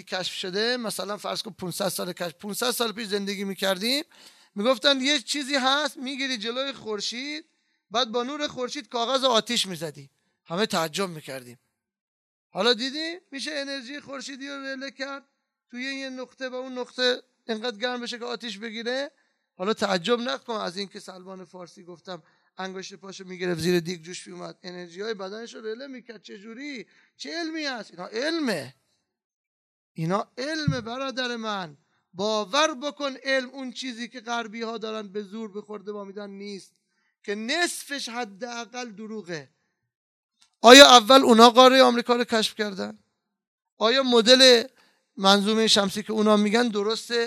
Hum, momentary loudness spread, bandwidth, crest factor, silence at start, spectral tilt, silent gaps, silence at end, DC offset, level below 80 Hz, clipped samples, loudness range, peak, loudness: none; 19 LU; 14 kHz; 24 dB; 0.05 s; -3 dB/octave; 12.01-12.50 s, 29.24-29.95 s, 39.96-40.29 s, 43.47-43.58 s, 43.72-43.77 s; 0 s; under 0.1%; -68 dBFS; under 0.1%; 18 LU; 0 dBFS; -22 LUFS